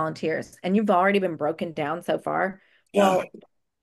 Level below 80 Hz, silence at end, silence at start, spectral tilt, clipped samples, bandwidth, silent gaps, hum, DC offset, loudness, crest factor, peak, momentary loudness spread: -70 dBFS; 0.45 s; 0 s; -6 dB/octave; under 0.1%; 12.5 kHz; none; none; under 0.1%; -24 LUFS; 18 dB; -6 dBFS; 9 LU